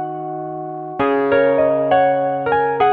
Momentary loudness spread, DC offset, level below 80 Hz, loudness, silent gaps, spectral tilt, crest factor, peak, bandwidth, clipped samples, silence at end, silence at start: 12 LU; under 0.1%; -54 dBFS; -17 LUFS; none; -9 dB/octave; 14 dB; -4 dBFS; 4.6 kHz; under 0.1%; 0 s; 0 s